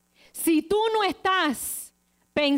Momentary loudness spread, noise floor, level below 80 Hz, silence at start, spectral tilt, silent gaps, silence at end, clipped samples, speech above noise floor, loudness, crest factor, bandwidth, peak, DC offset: 12 LU; -60 dBFS; -60 dBFS; 0.35 s; -2.5 dB/octave; none; 0 s; under 0.1%; 37 dB; -25 LUFS; 14 dB; 16 kHz; -12 dBFS; under 0.1%